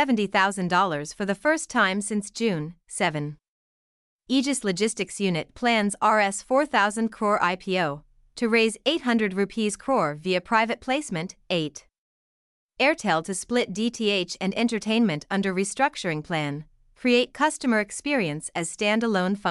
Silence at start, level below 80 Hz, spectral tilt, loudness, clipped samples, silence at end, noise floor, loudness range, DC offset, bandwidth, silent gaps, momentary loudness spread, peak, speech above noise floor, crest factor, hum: 0 s; -60 dBFS; -4 dB/octave; -24 LUFS; under 0.1%; 0 s; under -90 dBFS; 3 LU; under 0.1%; 12 kHz; 3.48-4.19 s, 11.98-12.69 s; 8 LU; -8 dBFS; over 66 dB; 18 dB; none